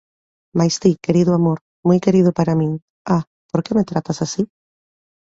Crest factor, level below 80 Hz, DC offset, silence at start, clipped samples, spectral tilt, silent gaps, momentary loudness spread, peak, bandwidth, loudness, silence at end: 16 dB; -54 dBFS; under 0.1%; 0.55 s; under 0.1%; -7 dB/octave; 1.61-1.83 s, 2.82-3.05 s, 3.27-3.49 s; 9 LU; -2 dBFS; 8 kHz; -18 LUFS; 0.85 s